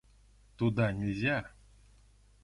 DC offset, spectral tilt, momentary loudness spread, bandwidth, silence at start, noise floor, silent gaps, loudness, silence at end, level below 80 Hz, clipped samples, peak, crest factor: under 0.1%; -7.5 dB/octave; 6 LU; 11 kHz; 0.6 s; -62 dBFS; none; -32 LUFS; 0.95 s; -56 dBFS; under 0.1%; -16 dBFS; 18 dB